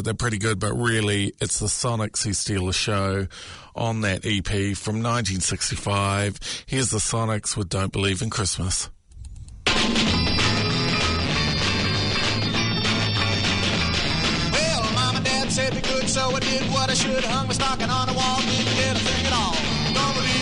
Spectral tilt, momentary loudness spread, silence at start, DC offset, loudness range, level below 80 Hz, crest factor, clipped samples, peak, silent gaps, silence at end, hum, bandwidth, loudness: -3.5 dB/octave; 5 LU; 0 s; under 0.1%; 3 LU; -38 dBFS; 14 dB; under 0.1%; -8 dBFS; none; 0 s; none; 11 kHz; -22 LUFS